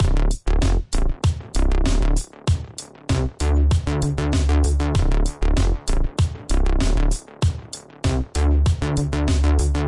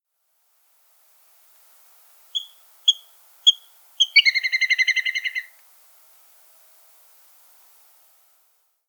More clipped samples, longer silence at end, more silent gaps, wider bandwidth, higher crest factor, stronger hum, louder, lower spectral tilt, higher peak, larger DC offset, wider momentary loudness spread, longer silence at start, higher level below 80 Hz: neither; second, 0 s vs 3.45 s; neither; second, 11.5 kHz vs over 20 kHz; second, 10 dB vs 24 dB; neither; second, -22 LUFS vs -19 LUFS; first, -6 dB/octave vs 10 dB/octave; second, -8 dBFS vs -2 dBFS; neither; second, 6 LU vs 15 LU; second, 0 s vs 2.35 s; first, -20 dBFS vs under -90 dBFS